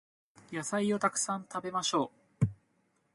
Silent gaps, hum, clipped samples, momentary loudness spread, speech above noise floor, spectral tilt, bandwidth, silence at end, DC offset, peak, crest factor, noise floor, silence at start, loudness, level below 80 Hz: none; none; under 0.1%; 9 LU; 41 dB; -4 dB/octave; 11.5 kHz; 0.6 s; under 0.1%; -14 dBFS; 20 dB; -74 dBFS; 0.5 s; -33 LUFS; -64 dBFS